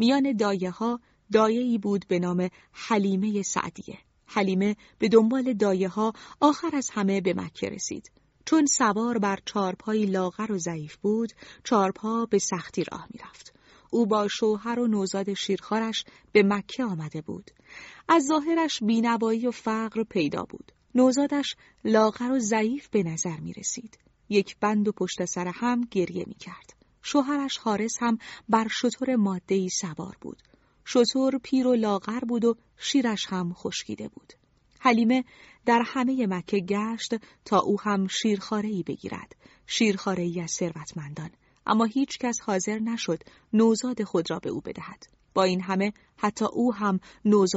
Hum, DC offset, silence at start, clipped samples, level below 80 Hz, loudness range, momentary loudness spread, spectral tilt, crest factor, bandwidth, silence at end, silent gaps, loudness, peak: none; under 0.1%; 0 s; under 0.1%; -64 dBFS; 3 LU; 13 LU; -4.5 dB/octave; 20 dB; 8 kHz; 0 s; none; -26 LUFS; -6 dBFS